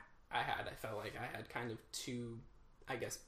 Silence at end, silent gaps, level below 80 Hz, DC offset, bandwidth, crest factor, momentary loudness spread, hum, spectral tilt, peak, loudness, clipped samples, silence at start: 0 s; none; -64 dBFS; under 0.1%; 15.5 kHz; 22 dB; 8 LU; none; -3.5 dB/octave; -24 dBFS; -44 LUFS; under 0.1%; 0 s